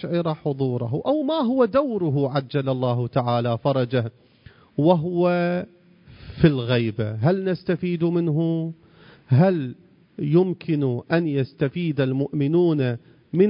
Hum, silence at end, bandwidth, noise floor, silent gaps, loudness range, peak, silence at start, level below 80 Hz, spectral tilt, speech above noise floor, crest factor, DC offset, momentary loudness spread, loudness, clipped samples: none; 0 s; 5.4 kHz; -51 dBFS; none; 1 LU; -2 dBFS; 0 s; -54 dBFS; -12.5 dB/octave; 29 dB; 20 dB; under 0.1%; 7 LU; -22 LUFS; under 0.1%